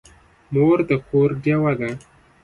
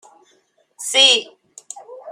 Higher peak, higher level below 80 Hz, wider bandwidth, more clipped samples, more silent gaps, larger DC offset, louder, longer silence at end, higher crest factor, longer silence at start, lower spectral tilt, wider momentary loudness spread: second, -6 dBFS vs 0 dBFS; first, -52 dBFS vs -82 dBFS; second, 11 kHz vs 16 kHz; neither; neither; neither; second, -20 LUFS vs -13 LUFS; first, 0.45 s vs 0 s; second, 14 dB vs 20 dB; second, 0.5 s vs 0.8 s; first, -9 dB/octave vs 2.5 dB/octave; second, 9 LU vs 25 LU